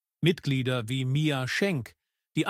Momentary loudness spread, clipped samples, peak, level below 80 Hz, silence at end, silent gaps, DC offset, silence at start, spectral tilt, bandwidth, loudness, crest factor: 8 LU; under 0.1%; -10 dBFS; -64 dBFS; 0 s; none; under 0.1%; 0.2 s; -6 dB/octave; 15.5 kHz; -28 LUFS; 18 dB